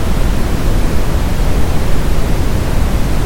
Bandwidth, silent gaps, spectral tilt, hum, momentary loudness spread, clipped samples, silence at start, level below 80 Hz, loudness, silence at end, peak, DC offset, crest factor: 17 kHz; none; -6 dB/octave; none; 1 LU; under 0.1%; 0 s; -14 dBFS; -17 LUFS; 0 s; 0 dBFS; under 0.1%; 10 dB